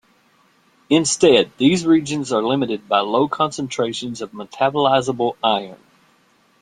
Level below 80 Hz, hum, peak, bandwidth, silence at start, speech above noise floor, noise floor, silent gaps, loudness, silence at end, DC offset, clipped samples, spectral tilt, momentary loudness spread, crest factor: -60 dBFS; none; -2 dBFS; 11 kHz; 0.9 s; 40 dB; -58 dBFS; none; -18 LUFS; 0.85 s; under 0.1%; under 0.1%; -4 dB/octave; 9 LU; 18 dB